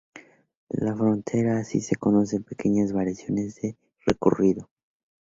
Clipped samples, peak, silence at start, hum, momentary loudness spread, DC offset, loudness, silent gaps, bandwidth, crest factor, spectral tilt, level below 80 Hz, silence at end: under 0.1%; -4 dBFS; 0.15 s; none; 9 LU; under 0.1%; -25 LUFS; 0.57-0.67 s; 7.8 kHz; 22 dB; -7.5 dB/octave; -54 dBFS; 0.6 s